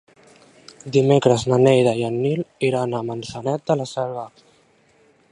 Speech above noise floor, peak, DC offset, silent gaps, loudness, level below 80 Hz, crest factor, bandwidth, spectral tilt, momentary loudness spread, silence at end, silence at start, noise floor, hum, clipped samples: 38 dB; -2 dBFS; under 0.1%; none; -20 LUFS; -58 dBFS; 20 dB; 10.5 kHz; -6.5 dB/octave; 13 LU; 1.05 s; 0.85 s; -57 dBFS; none; under 0.1%